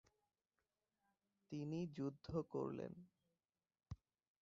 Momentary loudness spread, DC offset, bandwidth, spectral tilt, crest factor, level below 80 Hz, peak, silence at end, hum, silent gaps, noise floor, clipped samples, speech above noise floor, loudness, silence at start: 14 LU; under 0.1%; 7.4 kHz; -8 dB/octave; 20 dB; -72 dBFS; -30 dBFS; 0.45 s; none; none; under -90 dBFS; under 0.1%; over 43 dB; -48 LUFS; 1.5 s